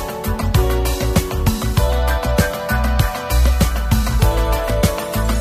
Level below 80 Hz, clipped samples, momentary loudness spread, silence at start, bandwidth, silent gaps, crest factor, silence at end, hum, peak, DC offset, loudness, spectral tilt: -18 dBFS; under 0.1%; 3 LU; 0 s; 15.5 kHz; none; 14 dB; 0 s; none; -2 dBFS; under 0.1%; -18 LUFS; -5.5 dB/octave